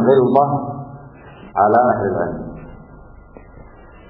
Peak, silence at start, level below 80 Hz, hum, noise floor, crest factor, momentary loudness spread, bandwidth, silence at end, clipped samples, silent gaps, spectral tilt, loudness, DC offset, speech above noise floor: -2 dBFS; 0 s; -44 dBFS; none; -41 dBFS; 18 dB; 23 LU; 4 kHz; 0.45 s; under 0.1%; none; -12 dB/octave; -17 LUFS; under 0.1%; 26 dB